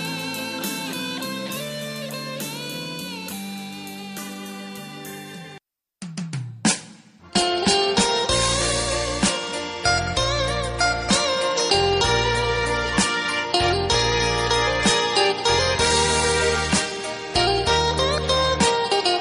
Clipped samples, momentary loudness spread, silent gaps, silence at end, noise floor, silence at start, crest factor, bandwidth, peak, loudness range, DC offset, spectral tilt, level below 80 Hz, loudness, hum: under 0.1%; 15 LU; none; 0 s; -49 dBFS; 0 s; 18 dB; 15.5 kHz; -4 dBFS; 12 LU; under 0.1%; -3 dB/octave; -38 dBFS; -21 LUFS; none